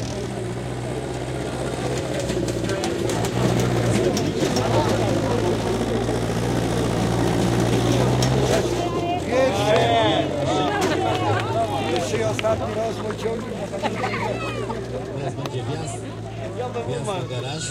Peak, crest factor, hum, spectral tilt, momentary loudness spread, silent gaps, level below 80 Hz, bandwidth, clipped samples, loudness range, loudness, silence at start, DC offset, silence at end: -6 dBFS; 18 dB; none; -5.5 dB/octave; 9 LU; none; -40 dBFS; 16 kHz; under 0.1%; 7 LU; -23 LUFS; 0 s; under 0.1%; 0 s